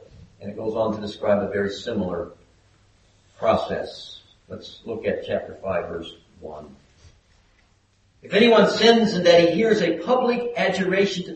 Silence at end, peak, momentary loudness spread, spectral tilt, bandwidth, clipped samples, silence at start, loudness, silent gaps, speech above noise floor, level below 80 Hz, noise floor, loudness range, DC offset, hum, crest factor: 0 s; -2 dBFS; 23 LU; -5.5 dB/octave; 8.4 kHz; under 0.1%; 0.2 s; -21 LUFS; none; 40 dB; -56 dBFS; -61 dBFS; 13 LU; under 0.1%; none; 22 dB